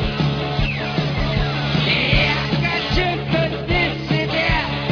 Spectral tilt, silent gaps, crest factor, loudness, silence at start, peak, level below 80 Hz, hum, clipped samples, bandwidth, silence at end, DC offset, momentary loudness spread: -6.5 dB/octave; none; 16 dB; -19 LUFS; 0 s; -2 dBFS; -30 dBFS; none; under 0.1%; 5.4 kHz; 0 s; under 0.1%; 5 LU